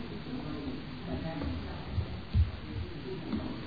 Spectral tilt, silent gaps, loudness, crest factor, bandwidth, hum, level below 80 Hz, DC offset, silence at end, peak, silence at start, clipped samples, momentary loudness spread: -6.5 dB/octave; none; -37 LUFS; 18 dB; 5 kHz; none; -40 dBFS; 0.4%; 0 s; -16 dBFS; 0 s; under 0.1%; 9 LU